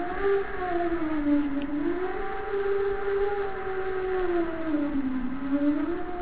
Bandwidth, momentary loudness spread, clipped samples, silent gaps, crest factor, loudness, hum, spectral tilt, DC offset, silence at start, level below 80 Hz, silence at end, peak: 4 kHz; 5 LU; under 0.1%; none; 12 dB; -28 LUFS; none; -10 dB/octave; 2%; 0 s; -46 dBFS; 0 s; -14 dBFS